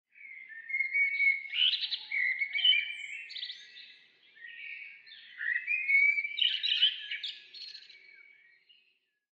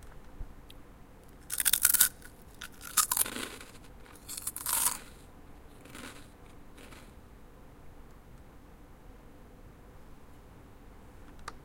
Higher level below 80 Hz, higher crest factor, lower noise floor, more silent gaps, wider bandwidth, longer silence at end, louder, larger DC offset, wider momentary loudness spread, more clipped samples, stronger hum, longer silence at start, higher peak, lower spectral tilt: second, under -90 dBFS vs -54 dBFS; second, 20 dB vs 36 dB; first, -74 dBFS vs -52 dBFS; neither; second, 8.6 kHz vs 17 kHz; first, 1.4 s vs 0 s; about the same, -28 LUFS vs -28 LUFS; neither; second, 23 LU vs 28 LU; neither; neither; first, 0.2 s vs 0 s; second, -14 dBFS vs -2 dBFS; second, 4 dB/octave vs 0 dB/octave